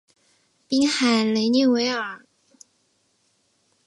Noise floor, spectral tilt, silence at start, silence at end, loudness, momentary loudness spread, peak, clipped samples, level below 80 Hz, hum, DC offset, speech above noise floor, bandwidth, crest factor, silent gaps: -67 dBFS; -3.5 dB/octave; 0.7 s; 1.7 s; -21 LUFS; 11 LU; -8 dBFS; under 0.1%; -72 dBFS; none; under 0.1%; 47 dB; 11.5 kHz; 16 dB; none